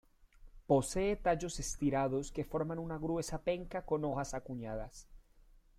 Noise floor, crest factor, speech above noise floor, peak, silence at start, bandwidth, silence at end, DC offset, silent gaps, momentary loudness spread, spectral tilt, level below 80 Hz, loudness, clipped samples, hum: -63 dBFS; 20 dB; 27 dB; -16 dBFS; 0.4 s; 16 kHz; 0.4 s; under 0.1%; none; 10 LU; -5.5 dB/octave; -52 dBFS; -36 LUFS; under 0.1%; none